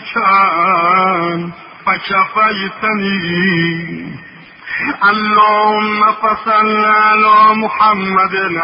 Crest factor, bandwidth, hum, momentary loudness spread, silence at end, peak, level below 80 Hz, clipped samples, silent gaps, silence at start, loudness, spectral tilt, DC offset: 12 dB; 5.6 kHz; none; 12 LU; 0 s; 0 dBFS; -54 dBFS; under 0.1%; none; 0 s; -12 LUFS; -10 dB/octave; under 0.1%